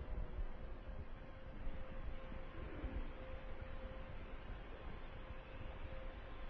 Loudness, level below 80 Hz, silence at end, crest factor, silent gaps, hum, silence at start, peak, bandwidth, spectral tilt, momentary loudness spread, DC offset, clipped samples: -53 LUFS; -48 dBFS; 0 s; 14 dB; none; none; 0 s; -32 dBFS; 4.9 kHz; -5.5 dB/octave; 5 LU; under 0.1%; under 0.1%